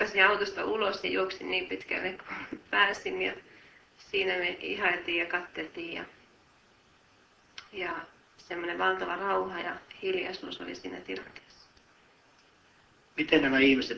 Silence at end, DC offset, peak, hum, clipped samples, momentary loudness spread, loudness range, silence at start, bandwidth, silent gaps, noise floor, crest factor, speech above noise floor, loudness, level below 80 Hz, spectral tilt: 0 s; under 0.1%; -6 dBFS; none; under 0.1%; 17 LU; 9 LU; 0 s; 8 kHz; none; -63 dBFS; 26 dB; 32 dB; -30 LUFS; -66 dBFS; -4 dB/octave